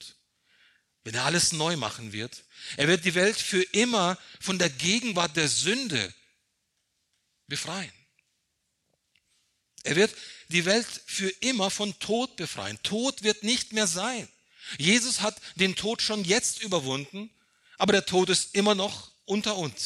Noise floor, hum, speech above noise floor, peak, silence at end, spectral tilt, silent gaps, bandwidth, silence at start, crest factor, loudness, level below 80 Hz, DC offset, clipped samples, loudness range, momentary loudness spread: -77 dBFS; none; 50 dB; -8 dBFS; 0 s; -3 dB/octave; none; 13.5 kHz; 0 s; 20 dB; -26 LUFS; -66 dBFS; under 0.1%; under 0.1%; 7 LU; 13 LU